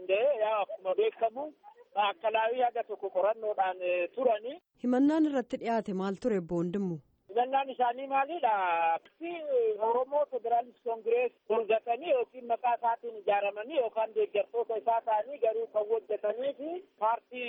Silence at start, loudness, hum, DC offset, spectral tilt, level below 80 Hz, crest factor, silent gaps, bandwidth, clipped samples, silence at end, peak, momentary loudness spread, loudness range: 0 s; -31 LUFS; none; under 0.1%; -7 dB/octave; -74 dBFS; 14 dB; none; 8.4 kHz; under 0.1%; 0 s; -16 dBFS; 7 LU; 1 LU